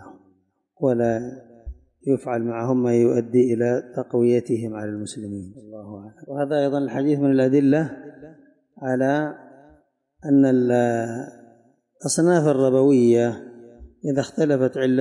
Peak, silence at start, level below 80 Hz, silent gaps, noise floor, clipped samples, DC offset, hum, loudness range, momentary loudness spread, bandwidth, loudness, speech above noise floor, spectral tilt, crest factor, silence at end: -8 dBFS; 0 s; -54 dBFS; none; -64 dBFS; under 0.1%; under 0.1%; none; 4 LU; 19 LU; 11.5 kHz; -21 LUFS; 44 dB; -6.5 dB/octave; 14 dB; 0 s